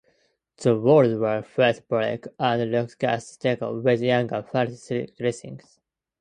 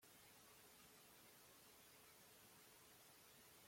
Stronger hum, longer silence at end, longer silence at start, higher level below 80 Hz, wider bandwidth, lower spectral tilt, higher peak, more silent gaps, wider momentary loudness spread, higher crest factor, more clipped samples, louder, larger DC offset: neither; first, 0.65 s vs 0 s; first, 0.6 s vs 0 s; first, -64 dBFS vs under -90 dBFS; second, 9.8 kHz vs 16.5 kHz; first, -6.5 dB/octave vs -2 dB/octave; first, -6 dBFS vs -54 dBFS; neither; first, 11 LU vs 0 LU; about the same, 18 dB vs 14 dB; neither; first, -23 LUFS vs -66 LUFS; neither